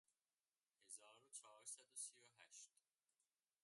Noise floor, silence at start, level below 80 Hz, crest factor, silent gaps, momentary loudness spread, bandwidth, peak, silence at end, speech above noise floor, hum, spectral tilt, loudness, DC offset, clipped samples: under -90 dBFS; 0.8 s; under -90 dBFS; 24 dB; none; 10 LU; 11.5 kHz; -40 dBFS; 0.95 s; over 30 dB; none; 1.5 dB/octave; -58 LUFS; under 0.1%; under 0.1%